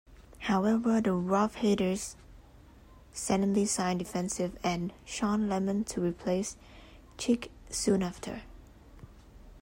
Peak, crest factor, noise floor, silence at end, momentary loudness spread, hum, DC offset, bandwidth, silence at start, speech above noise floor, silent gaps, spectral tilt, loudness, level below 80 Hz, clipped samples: -14 dBFS; 16 dB; -55 dBFS; 0 s; 11 LU; none; under 0.1%; 16 kHz; 0.1 s; 25 dB; none; -5 dB/octave; -31 LUFS; -54 dBFS; under 0.1%